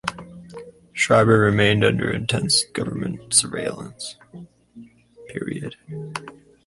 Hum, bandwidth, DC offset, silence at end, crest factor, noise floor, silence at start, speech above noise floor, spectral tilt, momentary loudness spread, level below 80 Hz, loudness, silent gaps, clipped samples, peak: none; 11.5 kHz; under 0.1%; 0.35 s; 20 dB; -46 dBFS; 0.05 s; 25 dB; -4 dB/octave; 22 LU; -50 dBFS; -20 LUFS; none; under 0.1%; -2 dBFS